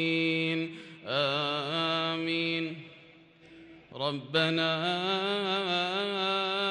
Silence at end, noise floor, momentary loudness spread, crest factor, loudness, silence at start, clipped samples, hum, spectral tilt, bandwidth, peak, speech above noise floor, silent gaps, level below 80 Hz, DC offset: 0 s; -56 dBFS; 9 LU; 16 dB; -29 LUFS; 0 s; under 0.1%; none; -5 dB/octave; 10.5 kHz; -14 dBFS; 26 dB; none; -76 dBFS; under 0.1%